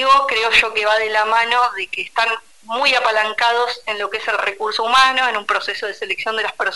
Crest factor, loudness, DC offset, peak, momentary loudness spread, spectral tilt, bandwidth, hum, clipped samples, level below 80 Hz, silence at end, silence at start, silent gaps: 16 dB; -17 LUFS; 0.4%; -2 dBFS; 9 LU; -0.5 dB/octave; 11.5 kHz; none; under 0.1%; -56 dBFS; 0 s; 0 s; none